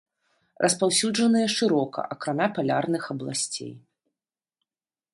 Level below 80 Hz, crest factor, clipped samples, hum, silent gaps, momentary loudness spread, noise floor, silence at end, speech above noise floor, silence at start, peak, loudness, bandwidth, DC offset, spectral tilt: -72 dBFS; 20 dB; under 0.1%; none; none; 9 LU; under -90 dBFS; 1.35 s; over 65 dB; 0.6 s; -8 dBFS; -25 LUFS; 11.5 kHz; under 0.1%; -3.5 dB/octave